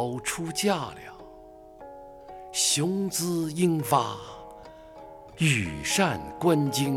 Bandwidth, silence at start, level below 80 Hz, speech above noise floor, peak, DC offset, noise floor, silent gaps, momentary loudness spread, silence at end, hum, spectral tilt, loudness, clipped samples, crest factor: 18 kHz; 0 s; -56 dBFS; 22 dB; -8 dBFS; under 0.1%; -48 dBFS; none; 23 LU; 0 s; none; -4 dB/octave; -26 LUFS; under 0.1%; 20 dB